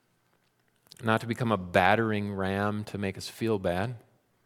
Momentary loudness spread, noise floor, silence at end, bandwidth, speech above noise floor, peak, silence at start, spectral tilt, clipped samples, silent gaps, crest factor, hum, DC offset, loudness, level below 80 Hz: 11 LU; -70 dBFS; 0.45 s; 16 kHz; 42 dB; -6 dBFS; 1 s; -6 dB/octave; under 0.1%; none; 24 dB; none; under 0.1%; -29 LUFS; -62 dBFS